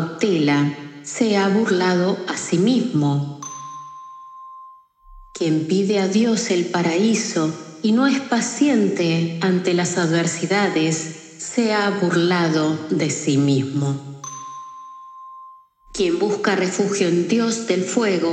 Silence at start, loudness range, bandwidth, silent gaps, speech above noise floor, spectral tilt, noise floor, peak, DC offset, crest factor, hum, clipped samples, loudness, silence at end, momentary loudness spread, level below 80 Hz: 0 s; 5 LU; 9.4 kHz; none; 27 dB; -5 dB/octave; -46 dBFS; -4 dBFS; under 0.1%; 16 dB; none; under 0.1%; -20 LUFS; 0 s; 17 LU; -58 dBFS